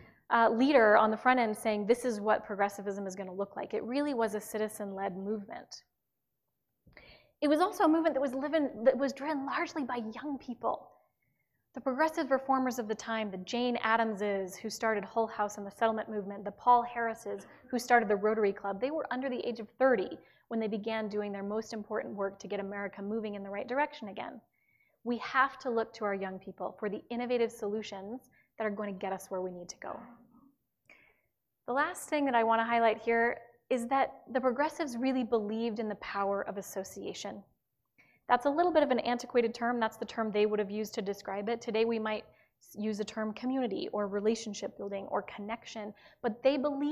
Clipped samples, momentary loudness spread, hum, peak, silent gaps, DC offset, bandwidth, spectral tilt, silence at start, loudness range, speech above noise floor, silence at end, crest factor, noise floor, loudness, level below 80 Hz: under 0.1%; 13 LU; none; -12 dBFS; none; under 0.1%; 15 kHz; -4.5 dB/octave; 0 s; 6 LU; 54 dB; 0 s; 22 dB; -86 dBFS; -32 LUFS; -72 dBFS